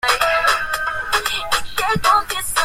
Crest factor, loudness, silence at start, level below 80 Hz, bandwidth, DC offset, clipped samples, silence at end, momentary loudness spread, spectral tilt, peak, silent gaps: 18 dB; -18 LUFS; 0.05 s; -40 dBFS; 16 kHz; under 0.1%; under 0.1%; 0 s; 5 LU; -1.5 dB/octave; -2 dBFS; none